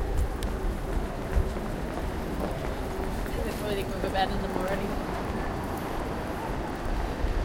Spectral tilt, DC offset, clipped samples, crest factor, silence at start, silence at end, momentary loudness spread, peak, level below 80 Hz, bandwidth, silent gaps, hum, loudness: -6 dB/octave; under 0.1%; under 0.1%; 16 dB; 0 s; 0 s; 4 LU; -12 dBFS; -34 dBFS; 17 kHz; none; none; -32 LUFS